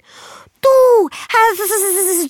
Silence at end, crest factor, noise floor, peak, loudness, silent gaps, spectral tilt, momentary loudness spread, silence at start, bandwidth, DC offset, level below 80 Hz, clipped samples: 0 s; 12 dB; -40 dBFS; -2 dBFS; -13 LUFS; none; -1 dB/octave; 6 LU; 0.2 s; 19 kHz; under 0.1%; -60 dBFS; under 0.1%